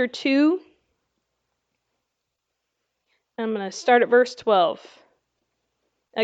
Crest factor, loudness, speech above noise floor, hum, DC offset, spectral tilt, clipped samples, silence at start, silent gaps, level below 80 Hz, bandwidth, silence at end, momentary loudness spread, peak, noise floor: 20 dB; -21 LUFS; 60 dB; none; under 0.1%; -4 dB/octave; under 0.1%; 0 s; none; -78 dBFS; 8 kHz; 0 s; 15 LU; -6 dBFS; -80 dBFS